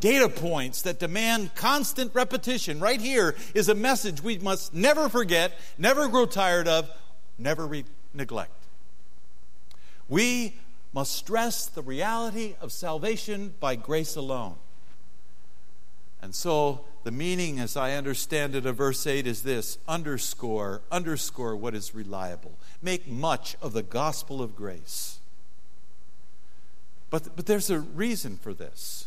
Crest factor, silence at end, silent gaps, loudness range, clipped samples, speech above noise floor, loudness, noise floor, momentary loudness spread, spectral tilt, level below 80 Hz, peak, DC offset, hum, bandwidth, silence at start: 22 dB; 0 s; none; 9 LU; under 0.1%; 33 dB; -28 LUFS; -61 dBFS; 13 LU; -3.5 dB/octave; -64 dBFS; -6 dBFS; 4%; none; 16 kHz; 0 s